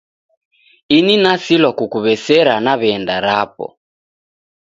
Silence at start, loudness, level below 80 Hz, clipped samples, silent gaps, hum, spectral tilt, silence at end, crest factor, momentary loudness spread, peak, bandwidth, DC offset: 0.9 s; -14 LUFS; -58 dBFS; under 0.1%; none; none; -5 dB/octave; 1 s; 16 dB; 7 LU; 0 dBFS; 7.8 kHz; under 0.1%